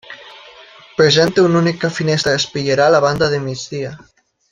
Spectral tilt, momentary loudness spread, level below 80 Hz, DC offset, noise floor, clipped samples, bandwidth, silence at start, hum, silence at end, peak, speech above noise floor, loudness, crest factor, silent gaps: -5 dB/octave; 15 LU; -50 dBFS; under 0.1%; -42 dBFS; under 0.1%; 12 kHz; 0.1 s; none; 0.55 s; -2 dBFS; 27 dB; -15 LUFS; 16 dB; none